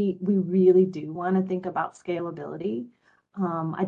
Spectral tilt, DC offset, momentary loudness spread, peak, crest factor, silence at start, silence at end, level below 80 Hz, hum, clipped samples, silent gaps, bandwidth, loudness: -9.5 dB/octave; under 0.1%; 14 LU; -8 dBFS; 16 dB; 0 s; 0 s; -72 dBFS; none; under 0.1%; none; 7.8 kHz; -25 LUFS